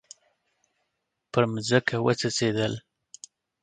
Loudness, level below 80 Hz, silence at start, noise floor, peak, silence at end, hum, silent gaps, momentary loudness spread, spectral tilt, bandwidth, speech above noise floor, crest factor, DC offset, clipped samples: -25 LUFS; -64 dBFS; 1.35 s; -80 dBFS; -6 dBFS; 0.85 s; none; none; 23 LU; -4.5 dB/octave; 9.4 kHz; 55 dB; 24 dB; under 0.1%; under 0.1%